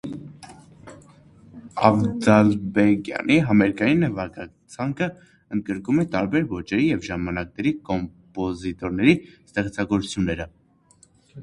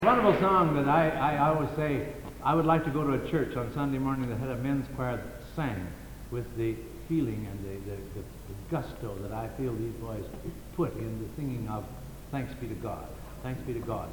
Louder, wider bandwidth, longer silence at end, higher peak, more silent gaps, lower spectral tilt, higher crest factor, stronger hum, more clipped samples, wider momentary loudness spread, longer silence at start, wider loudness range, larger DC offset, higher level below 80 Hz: first, -22 LUFS vs -31 LUFS; second, 11 kHz vs 19.5 kHz; about the same, 0 s vs 0 s; first, 0 dBFS vs -10 dBFS; neither; about the same, -7 dB/octave vs -7.5 dB/octave; about the same, 22 dB vs 20 dB; neither; neither; about the same, 14 LU vs 15 LU; about the same, 0.05 s vs 0 s; second, 5 LU vs 9 LU; neither; about the same, -48 dBFS vs -48 dBFS